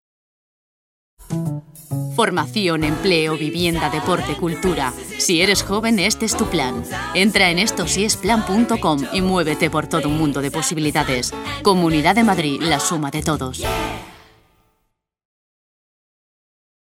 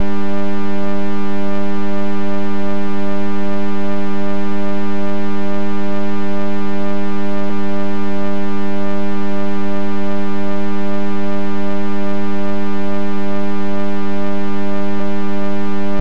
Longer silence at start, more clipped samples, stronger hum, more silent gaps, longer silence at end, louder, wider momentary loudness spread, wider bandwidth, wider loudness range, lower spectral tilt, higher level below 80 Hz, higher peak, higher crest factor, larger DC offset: first, 1.2 s vs 0 s; neither; neither; neither; first, 2.7 s vs 0 s; first, -18 LUFS vs -22 LUFS; first, 9 LU vs 0 LU; first, 16.5 kHz vs 8.8 kHz; first, 6 LU vs 0 LU; second, -4 dB/octave vs -7.5 dB/octave; about the same, -40 dBFS vs -44 dBFS; first, 0 dBFS vs -4 dBFS; first, 20 dB vs 14 dB; second, under 0.1% vs 40%